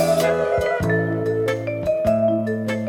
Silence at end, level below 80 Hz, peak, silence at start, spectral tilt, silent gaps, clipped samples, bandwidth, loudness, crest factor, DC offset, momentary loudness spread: 0 s; -44 dBFS; -8 dBFS; 0 s; -6.5 dB/octave; none; under 0.1%; 18 kHz; -21 LUFS; 12 dB; under 0.1%; 4 LU